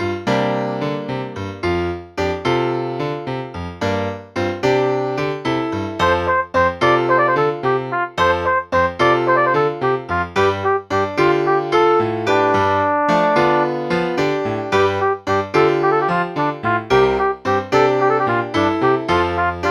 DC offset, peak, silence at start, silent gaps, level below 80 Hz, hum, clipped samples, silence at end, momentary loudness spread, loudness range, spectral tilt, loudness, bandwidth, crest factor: under 0.1%; -2 dBFS; 0 s; none; -46 dBFS; none; under 0.1%; 0 s; 8 LU; 5 LU; -6 dB/octave; -18 LUFS; 12 kHz; 16 dB